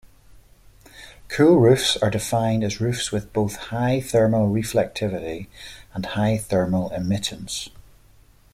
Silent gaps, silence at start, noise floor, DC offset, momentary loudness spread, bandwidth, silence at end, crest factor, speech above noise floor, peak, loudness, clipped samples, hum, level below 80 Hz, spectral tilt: none; 0.05 s; -53 dBFS; under 0.1%; 15 LU; 16 kHz; 0.85 s; 18 dB; 31 dB; -4 dBFS; -22 LUFS; under 0.1%; none; -48 dBFS; -5.5 dB/octave